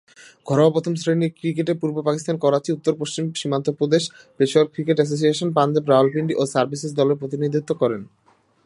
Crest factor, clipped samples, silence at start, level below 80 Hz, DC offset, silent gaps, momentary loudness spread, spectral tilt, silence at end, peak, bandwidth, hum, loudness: 18 dB; under 0.1%; 0.45 s; -68 dBFS; under 0.1%; none; 6 LU; -6 dB/octave; 0.6 s; -2 dBFS; 11.5 kHz; none; -21 LUFS